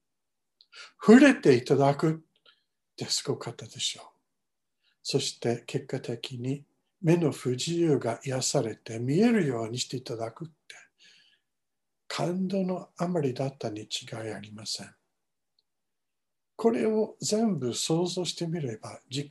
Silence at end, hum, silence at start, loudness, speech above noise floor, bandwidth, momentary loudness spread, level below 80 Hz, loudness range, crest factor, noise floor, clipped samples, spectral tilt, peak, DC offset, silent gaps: 0 s; none; 0.75 s; -28 LUFS; 62 dB; 12.5 kHz; 14 LU; -74 dBFS; 11 LU; 22 dB; -89 dBFS; under 0.1%; -5 dB/octave; -6 dBFS; under 0.1%; none